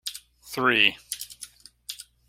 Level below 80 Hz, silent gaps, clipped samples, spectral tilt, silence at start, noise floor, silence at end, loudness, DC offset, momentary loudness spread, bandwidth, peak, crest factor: -64 dBFS; none; under 0.1%; -2 dB/octave; 0.05 s; -47 dBFS; 0.25 s; -23 LUFS; under 0.1%; 23 LU; 16.5 kHz; -4 dBFS; 24 dB